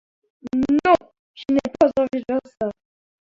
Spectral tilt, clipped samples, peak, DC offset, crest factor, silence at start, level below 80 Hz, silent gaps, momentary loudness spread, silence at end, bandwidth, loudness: -6.5 dB/octave; under 0.1%; -2 dBFS; under 0.1%; 20 dB; 0.45 s; -54 dBFS; 1.19-1.34 s; 11 LU; 0.5 s; 7.4 kHz; -21 LUFS